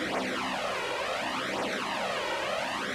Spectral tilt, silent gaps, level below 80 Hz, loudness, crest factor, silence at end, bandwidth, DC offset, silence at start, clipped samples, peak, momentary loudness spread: -3 dB/octave; none; -62 dBFS; -31 LUFS; 12 dB; 0 s; 15.5 kHz; under 0.1%; 0 s; under 0.1%; -20 dBFS; 1 LU